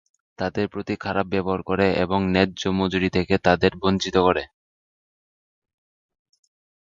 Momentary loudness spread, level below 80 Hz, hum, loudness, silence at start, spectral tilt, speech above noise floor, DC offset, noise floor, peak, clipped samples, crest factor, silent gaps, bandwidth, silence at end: 8 LU; -46 dBFS; none; -22 LUFS; 0.4 s; -6 dB/octave; over 68 dB; under 0.1%; under -90 dBFS; -2 dBFS; under 0.1%; 22 dB; none; 7.6 kHz; 2.35 s